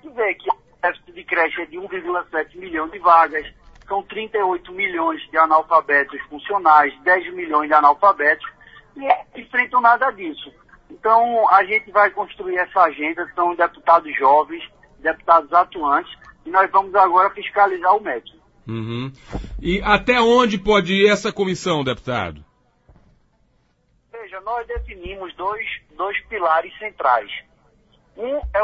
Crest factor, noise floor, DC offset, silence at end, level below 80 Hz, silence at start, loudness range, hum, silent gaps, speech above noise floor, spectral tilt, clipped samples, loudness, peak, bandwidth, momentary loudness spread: 18 dB; -62 dBFS; under 0.1%; 0 s; -44 dBFS; 0.05 s; 8 LU; none; none; 44 dB; -5 dB/octave; under 0.1%; -18 LUFS; 0 dBFS; 8 kHz; 16 LU